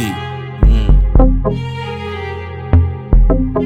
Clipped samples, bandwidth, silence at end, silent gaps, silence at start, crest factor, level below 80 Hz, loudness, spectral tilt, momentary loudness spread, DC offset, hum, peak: under 0.1%; 8 kHz; 0 s; none; 0 s; 12 dB; -14 dBFS; -16 LUFS; -8 dB/octave; 11 LU; under 0.1%; none; 0 dBFS